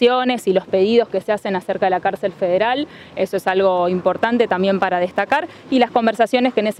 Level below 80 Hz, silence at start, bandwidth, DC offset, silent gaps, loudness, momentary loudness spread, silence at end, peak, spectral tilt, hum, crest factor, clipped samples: -60 dBFS; 0 s; 14.5 kHz; under 0.1%; none; -18 LUFS; 6 LU; 0.05 s; -2 dBFS; -6 dB/octave; none; 14 dB; under 0.1%